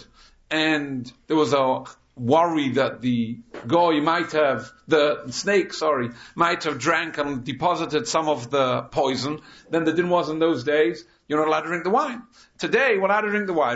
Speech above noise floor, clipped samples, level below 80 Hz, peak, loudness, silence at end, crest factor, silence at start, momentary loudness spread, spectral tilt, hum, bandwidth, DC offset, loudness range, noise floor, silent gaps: 30 dB; under 0.1%; -60 dBFS; -6 dBFS; -22 LUFS; 0 s; 16 dB; 0 s; 10 LU; -5 dB/octave; none; 8 kHz; under 0.1%; 2 LU; -52 dBFS; none